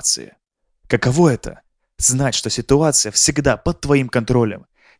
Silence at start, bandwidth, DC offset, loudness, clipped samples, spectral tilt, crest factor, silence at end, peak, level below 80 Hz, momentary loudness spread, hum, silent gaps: 0 s; 10.5 kHz; under 0.1%; -17 LUFS; under 0.1%; -4 dB/octave; 18 dB; 0.4 s; 0 dBFS; -38 dBFS; 8 LU; none; none